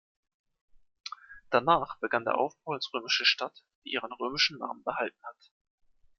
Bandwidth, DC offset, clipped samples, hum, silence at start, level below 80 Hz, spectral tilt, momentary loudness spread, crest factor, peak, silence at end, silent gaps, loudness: 11.5 kHz; under 0.1%; under 0.1%; none; 1.05 s; -66 dBFS; -3 dB/octave; 19 LU; 24 dB; -8 dBFS; 0.85 s; 3.75-3.82 s; -29 LUFS